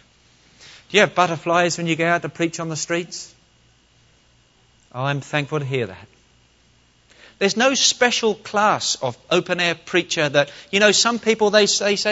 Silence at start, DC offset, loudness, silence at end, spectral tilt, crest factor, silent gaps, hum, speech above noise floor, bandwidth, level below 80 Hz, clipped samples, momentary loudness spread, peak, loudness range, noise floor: 0.65 s; under 0.1%; -19 LUFS; 0 s; -3 dB/octave; 20 dB; none; none; 37 dB; 8.2 kHz; -62 dBFS; under 0.1%; 10 LU; 0 dBFS; 10 LU; -57 dBFS